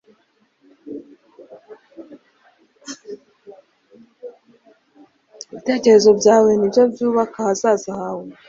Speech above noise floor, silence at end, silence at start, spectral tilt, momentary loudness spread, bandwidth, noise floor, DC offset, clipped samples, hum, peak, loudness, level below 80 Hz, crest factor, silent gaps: 47 dB; 0.15 s; 0.85 s; -4.5 dB/octave; 27 LU; 7.6 kHz; -62 dBFS; under 0.1%; under 0.1%; none; -2 dBFS; -16 LUFS; -64 dBFS; 18 dB; none